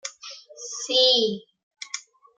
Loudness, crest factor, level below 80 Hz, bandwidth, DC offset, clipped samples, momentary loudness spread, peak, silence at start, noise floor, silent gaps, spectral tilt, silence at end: -20 LUFS; 20 dB; -80 dBFS; 9.4 kHz; under 0.1%; under 0.1%; 23 LU; -6 dBFS; 0.05 s; -44 dBFS; 1.63-1.71 s; -1.5 dB/octave; 0.35 s